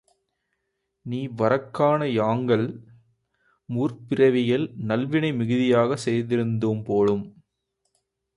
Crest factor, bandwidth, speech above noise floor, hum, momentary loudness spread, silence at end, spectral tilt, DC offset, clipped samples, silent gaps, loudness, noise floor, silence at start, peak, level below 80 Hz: 18 dB; 11 kHz; 55 dB; none; 11 LU; 1.05 s; -7.5 dB/octave; under 0.1%; under 0.1%; none; -23 LUFS; -78 dBFS; 1.05 s; -8 dBFS; -62 dBFS